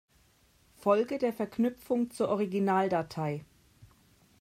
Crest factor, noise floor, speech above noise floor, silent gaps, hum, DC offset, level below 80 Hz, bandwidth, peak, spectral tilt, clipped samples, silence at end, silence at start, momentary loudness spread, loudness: 18 dB; -65 dBFS; 36 dB; none; none; under 0.1%; -68 dBFS; 16 kHz; -12 dBFS; -7 dB/octave; under 0.1%; 0.55 s; 0.85 s; 7 LU; -30 LUFS